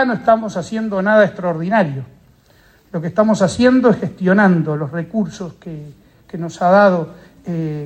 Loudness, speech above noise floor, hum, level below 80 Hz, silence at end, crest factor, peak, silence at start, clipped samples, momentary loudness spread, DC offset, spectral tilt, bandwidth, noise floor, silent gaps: -16 LUFS; 35 dB; none; -54 dBFS; 0 s; 16 dB; 0 dBFS; 0 s; under 0.1%; 18 LU; under 0.1%; -7 dB/octave; 9.8 kHz; -51 dBFS; none